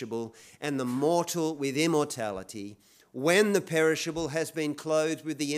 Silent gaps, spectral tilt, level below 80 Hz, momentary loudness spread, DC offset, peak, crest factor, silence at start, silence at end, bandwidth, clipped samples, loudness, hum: none; -4.5 dB/octave; -66 dBFS; 14 LU; under 0.1%; -10 dBFS; 18 dB; 0 s; 0 s; 16 kHz; under 0.1%; -28 LUFS; none